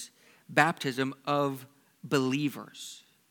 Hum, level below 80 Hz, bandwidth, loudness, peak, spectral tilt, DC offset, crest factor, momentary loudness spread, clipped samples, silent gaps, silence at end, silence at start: none; -84 dBFS; 19 kHz; -29 LUFS; -4 dBFS; -5 dB/octave; under 0.1%; 26 dB; 19 LU; under 0.1%; none; 0.35 s; 0 s